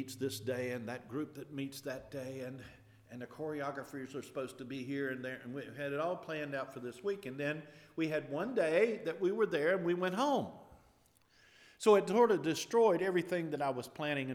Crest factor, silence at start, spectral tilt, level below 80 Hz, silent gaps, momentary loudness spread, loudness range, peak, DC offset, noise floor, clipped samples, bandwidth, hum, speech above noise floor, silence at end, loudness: 20 dB; 0 s; -5.5 dB/octave; -76 dBFS; none; 15 LU; 11 LU; -16 dBFS; under 0.1%; -69 dBFS; under 0.1%; 16.5 kHz; none; 33 dB; 0 s; -36 LUFS